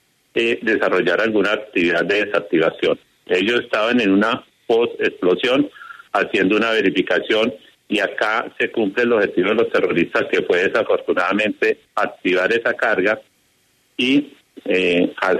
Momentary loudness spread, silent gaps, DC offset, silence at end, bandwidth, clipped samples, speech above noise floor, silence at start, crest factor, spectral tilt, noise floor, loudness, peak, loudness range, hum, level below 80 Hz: 5 LU; none; under 0.1%; 0 s; 12.5 kHz; under 0.1%; 43 dB; 0.35 s; 14 dB; -5 dB/octave; -61 dBFS; -18 LUFS; -4 dBFS; 1 LU; none; -62 dBFS